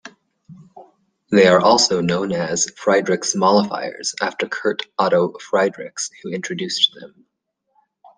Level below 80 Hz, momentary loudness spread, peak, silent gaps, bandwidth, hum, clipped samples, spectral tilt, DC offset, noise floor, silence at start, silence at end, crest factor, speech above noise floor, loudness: -60 dBFS; 12 LU; -2 dBFS; none; 10 kHz; none; under 0.1%; -3.5 dB/octave; under 0.1%; -74 dBFS; 0.05 s; 1.1 s; 18 dB; 56 dB; -18 LUFS